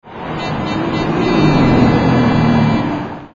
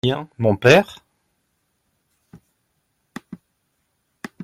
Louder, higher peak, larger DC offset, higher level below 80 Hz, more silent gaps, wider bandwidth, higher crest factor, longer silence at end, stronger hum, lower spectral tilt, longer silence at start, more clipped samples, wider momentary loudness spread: first, -14 LUFS vs -17 LUFS; about the same, 0 dBFS vs 0 dBFS; neither; first, -32 dBFS vs -56 dBFS; neither; second, 7.4 kHz vs 15.5 kHz; second, 14 dB vs 24 dB; about the same, 0.1 s vs 0 s; neither; first, -7.5 dB/octave vs -5.5 dB/octave; about the same, 0.05 s vs 0.05 s; neither; second, 10 LU vs 28 LU